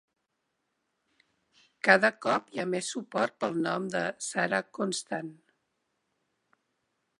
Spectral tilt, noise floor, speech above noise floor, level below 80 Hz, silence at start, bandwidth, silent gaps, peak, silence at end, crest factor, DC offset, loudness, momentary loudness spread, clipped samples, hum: -3.5 dB/octave; -81 dBFS; 51 dB; -82 dBFS; 1.85 s; 11.5 kHz; none; -4 dBFS; 1.85 s; 28 dB; under 0.1%; -29 LUFS; 11 LU; under 0.1%; none